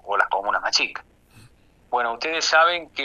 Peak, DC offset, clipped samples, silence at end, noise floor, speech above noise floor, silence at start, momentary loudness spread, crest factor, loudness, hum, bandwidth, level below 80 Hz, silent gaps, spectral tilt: -4 dBFS; under 0.1%; under 0.1%; 0 s; -54 dBFS; 32 dB; 0.05 s; 10 LU; 20 dB; -21 LUFS; none; 11.5 kHz; -60 dBFS; none; 0 dB/octave